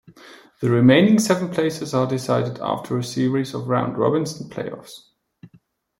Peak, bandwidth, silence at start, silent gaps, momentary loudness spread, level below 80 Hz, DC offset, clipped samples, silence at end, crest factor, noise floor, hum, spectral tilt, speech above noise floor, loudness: -2 dBFS; 16.5 kHz; 0.25 s; none; 16 LU; -62 dBFS; under 0.1%; under 0.1%; 0.55 s; 18 dB; -57 dBFS; none; -6 dB/octave; 37 dB; -20 LUFS